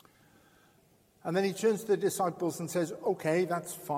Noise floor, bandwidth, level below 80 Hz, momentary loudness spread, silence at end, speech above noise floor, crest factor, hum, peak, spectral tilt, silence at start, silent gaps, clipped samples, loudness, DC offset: -65 dBFS; 16.5 kHz; -76 dBFS; 6 LU; 0 s; 35 dB; 16 dB; none; -16 dBFS; -5 dB/octave; 1.25 s; none; under 0.1%; -31 LUFS; under 0.1%